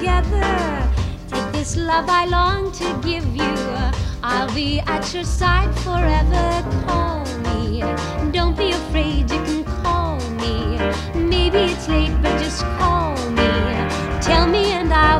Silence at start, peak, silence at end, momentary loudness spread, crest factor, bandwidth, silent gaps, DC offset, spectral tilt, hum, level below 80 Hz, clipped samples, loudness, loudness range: 0 s; -2 dBFS; 0 s; 6 LU; 18 dB; 11.5 kHz; none; under 0.1%; -5.5 dB/octave; none; -24 dBFS; under 0.1%; -20 LUFS; 2 LU